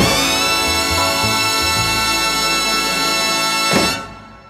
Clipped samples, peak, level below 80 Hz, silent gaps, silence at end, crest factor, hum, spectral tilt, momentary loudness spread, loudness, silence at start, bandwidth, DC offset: under 0.1%; -2 dBFS; -36 dBFS; none; 0 s; 14 dB; none; -2 dB/octave; 1 LU; -15 LUFS; 0 s; 15.5 kHz; under 0.1%